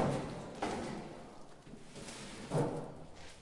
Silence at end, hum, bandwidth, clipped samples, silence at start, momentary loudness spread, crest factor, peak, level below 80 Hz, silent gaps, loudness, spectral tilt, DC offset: 0 s; none; 11.5 kHz; under 0.1%; 0 s; 18 LU; 18 dB; -22 dBFS; -60 dBFS; none; -41 LUFS; -6 dB/octave; under 0.1%